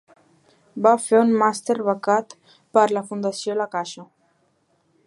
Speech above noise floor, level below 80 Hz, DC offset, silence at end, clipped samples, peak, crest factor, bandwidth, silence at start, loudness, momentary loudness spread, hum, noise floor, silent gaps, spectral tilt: 45 dB; -78 dBFS; under 0.1%; 1 s; under 0.1%; -2 dBFS; 20 dB; 11.5 kHz; 0.75 s; -21 LUFS; 12 LU; none; -65 dBFS; none; -4.5 dB/octave